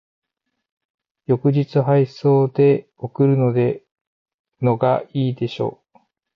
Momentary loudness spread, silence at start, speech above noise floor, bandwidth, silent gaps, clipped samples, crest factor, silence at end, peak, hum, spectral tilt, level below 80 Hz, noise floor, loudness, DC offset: 10 LU; 1.3 s; 60 dB; 6 kHz; 4.07-4.26 s, 4.34-4.45 s; under 0.1%; 14 dB; 0.65 s; -6 dBFS; none; -10 dB/octave; -62 dBFS; -78 dBFS; -19 LUFS; under 0.1%